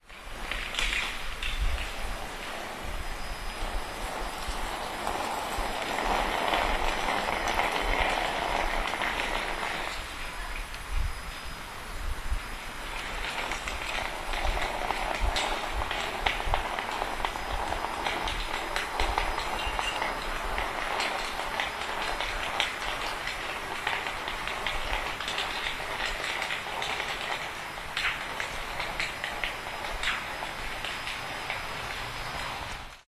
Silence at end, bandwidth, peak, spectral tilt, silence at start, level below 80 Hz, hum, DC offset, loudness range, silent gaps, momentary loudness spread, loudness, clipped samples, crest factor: 0.05 s; 14 kHz; -6 dBFS; -2.5 dB/octave; 0.05 s; -38 dBFS; none; under 0.1%; 6 LU; none; 8 LU; -31 LUFS; under 0.1%; 26 dB